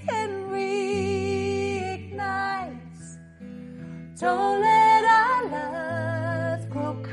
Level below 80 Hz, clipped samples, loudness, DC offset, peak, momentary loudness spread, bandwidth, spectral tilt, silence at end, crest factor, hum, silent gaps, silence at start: -64 dBFS; under 0.1%; -24 LUFS; under 0.1%; -8 dBFS; 23 LU; 11 kHz; -5.5 dB/octave; 0 s; 16 dB; none; none; 0 s